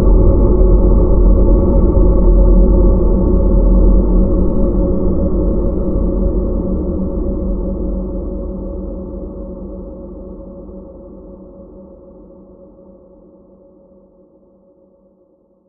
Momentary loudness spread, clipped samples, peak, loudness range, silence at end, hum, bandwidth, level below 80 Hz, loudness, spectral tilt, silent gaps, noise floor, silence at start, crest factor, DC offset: 20 LU; under 0.1%; 0 dBFS; 20 LU; 3.85 s; none; 1.5 kHz; -14 dBFS; -15 LUFS; -15.5 dB/octave; none; -54 dBFS; 0 s; 14 dB; under 0.1%